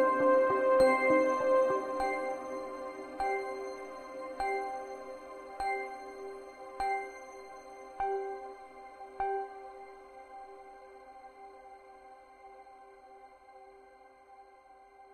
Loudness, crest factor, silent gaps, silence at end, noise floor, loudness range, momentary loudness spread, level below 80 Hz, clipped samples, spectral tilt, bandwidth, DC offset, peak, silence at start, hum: -32 LUFS; 20 dB; none; 0 s; -58 dBFS; 24 LU; 27 LU; -64 dBFS; under 0.1%; -4.5 dB/octave; 11 kHz; under 0.1%; -16 dBFS; 0 s; none